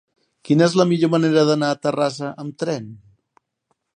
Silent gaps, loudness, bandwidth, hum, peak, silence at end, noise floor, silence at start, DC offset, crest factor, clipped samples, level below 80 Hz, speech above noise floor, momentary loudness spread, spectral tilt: none; -19 LUFS; 10 kHz; none; -2 dBFS; 1 s; -72 dBFS; 0.45 s; under 0.1%; 18 dB; under 0.1%; -68 dBFS; 53 dB; 13 LU; -6 dB/octave